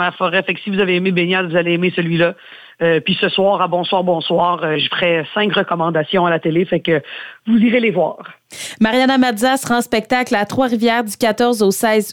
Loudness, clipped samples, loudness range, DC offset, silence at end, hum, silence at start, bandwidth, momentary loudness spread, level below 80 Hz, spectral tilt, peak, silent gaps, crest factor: -16 LUFS; under 0.1%; 1 LU; under 0.1%; 0 s; none; 0 s; 18 kHz; 5 LU; -56 dBFS; -5 dB/octave; -2 dBFS; none; 14 dB